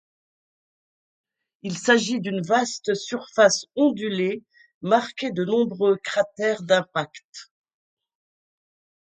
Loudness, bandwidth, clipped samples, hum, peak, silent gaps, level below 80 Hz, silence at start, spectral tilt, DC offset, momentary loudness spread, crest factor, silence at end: -23 LUFS; 9.4 kHz; under 0.1%; none; -4 dBFS; 4.74-4.81 s, 7.25-7.33 s; -72 dBFS; 1.65 s; -4 dB/octave; under 0.1%; 16 LU; 20 dB; 1.65 s